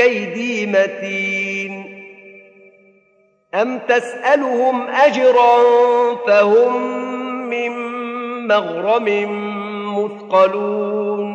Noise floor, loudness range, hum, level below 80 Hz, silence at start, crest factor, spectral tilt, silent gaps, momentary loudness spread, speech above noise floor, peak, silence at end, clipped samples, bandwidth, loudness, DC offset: -58 dBFS; 8 LU; none; -78 dBFS; 0 s; 16 dB; -5 dB/octave; none; 13 LU; 42 dB; 0 dBFS; 0 s; under 0.1%; 9.2 kHz; -17 LUFS; under 0.1%